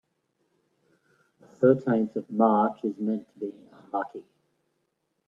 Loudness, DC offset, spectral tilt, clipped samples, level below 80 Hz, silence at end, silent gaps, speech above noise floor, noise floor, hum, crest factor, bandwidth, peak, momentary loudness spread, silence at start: -26 LUFS; under 0.1%; -10 dB/octave; under 0.1%; -78 dBFS; 1.05 s; none; 51 dB; -77 dBFS; none; 22 dB; 4 kHz; -6 dBFS; 16 LU; 1.6 s